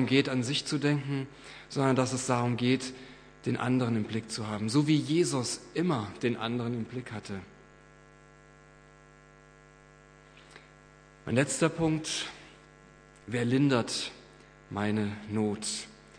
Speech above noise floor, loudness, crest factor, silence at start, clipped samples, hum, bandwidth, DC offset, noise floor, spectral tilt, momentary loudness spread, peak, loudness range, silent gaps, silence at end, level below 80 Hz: 26 dB; -30 LUFS; 20 dB; 0 s; under 0.1%; none; 10.5 kHz; under 0.1%; -56 dBFS; -5 dB/octave; 14 LU; -10 dBFS; 9 LU; none; 0.25 s; -64 dBFS